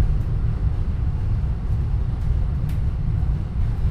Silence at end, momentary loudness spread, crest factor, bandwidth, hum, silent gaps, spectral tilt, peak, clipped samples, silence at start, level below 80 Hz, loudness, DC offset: 0 s; 1 LU; 12 dB; 5.6 kHz; none; none; -9.5 dB/octave; -8 dBFS; under 0.1%; 0 s; -22 dBFS; -24 LUFS; under 0.1%